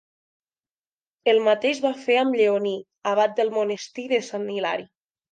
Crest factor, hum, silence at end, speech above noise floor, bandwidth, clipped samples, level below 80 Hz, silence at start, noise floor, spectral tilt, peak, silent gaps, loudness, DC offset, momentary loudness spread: 18 dB; none; 0.45 s; over 68 dB; 9.2 kHz; under 0.1%; -80 dBFS; 1.25 s; under -90 dBFS; -4 dB/octave; -6 dBFS; none; -23 LUFS; under 0.1%; 10 LU